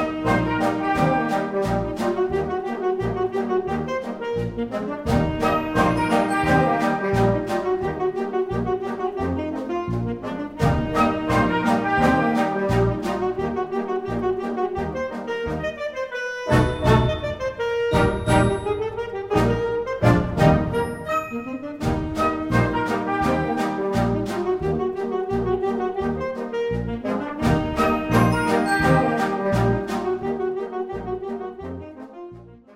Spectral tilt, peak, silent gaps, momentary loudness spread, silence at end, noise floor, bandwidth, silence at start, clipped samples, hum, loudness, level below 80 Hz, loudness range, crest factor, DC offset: -7 dB/octave; -4 dBFS; none; 9 LU; 0 s; -42 dBFS; 16 kHz; 0 s; under 0.1%; none; -23 LUFS; -38 dBFS; 4 LU; 20 dB; under 0.1%